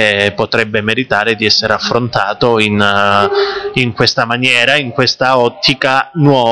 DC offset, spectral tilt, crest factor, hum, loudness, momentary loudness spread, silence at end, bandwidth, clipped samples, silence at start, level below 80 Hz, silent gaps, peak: 0.3%; -4.5 dB/octave; 12 dB; none; -11 LUFS; 4 LU; 0 s; 11 kHz; 0.9%; 0 s; -46 dBFS; none; 0 dBFS